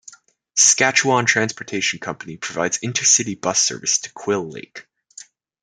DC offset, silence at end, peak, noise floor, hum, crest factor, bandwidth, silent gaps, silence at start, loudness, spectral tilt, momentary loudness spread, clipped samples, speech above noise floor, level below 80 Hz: under 0.1%; 0.8 s; 0 dBFS; -47 dBFS; none; 22 dB; 11 kHz; none; 0.55 s; -17 LUFS; -1.5 dB/octave; 15 LU; under 0.1%; 27 dB; -66 dBFS